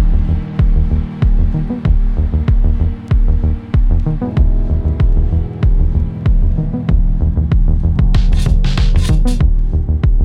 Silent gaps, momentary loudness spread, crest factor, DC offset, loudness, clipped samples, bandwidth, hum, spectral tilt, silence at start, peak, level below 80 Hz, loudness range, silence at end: none; 3 LU; 10 dB; under 0.1%; -16 LUFS; under 0.1%; 6.8 kHz; none; -8 dB/octave; 0 s; 0 dBFS; -12 dBFS; 1 LU; 0 s